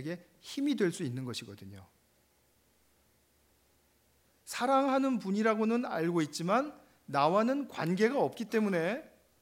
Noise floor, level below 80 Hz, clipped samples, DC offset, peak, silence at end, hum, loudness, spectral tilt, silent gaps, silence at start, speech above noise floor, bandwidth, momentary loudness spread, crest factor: -70 dBFS; -78 dBFS; under 0.1%; under 0.1%; -14 dBFS; 0.35 s; none; -32 LUFS; -5.5 dB/octave; none; 0 s; 39 dB; 16 kHz; 14 LU; 20 dB